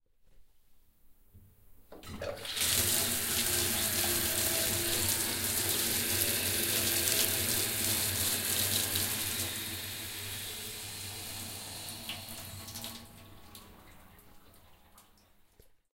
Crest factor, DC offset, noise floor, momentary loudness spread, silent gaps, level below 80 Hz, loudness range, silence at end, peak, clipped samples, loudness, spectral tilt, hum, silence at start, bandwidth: 26 dB; under 0.1%; -63 dBFS; 14 LU; none; -56 dBFS; 15 LU; 1 s; -8 dBFS; under 0.1%; -30 LUFS; -1.5 dB/octave; none; 0.3 s; 17 kHz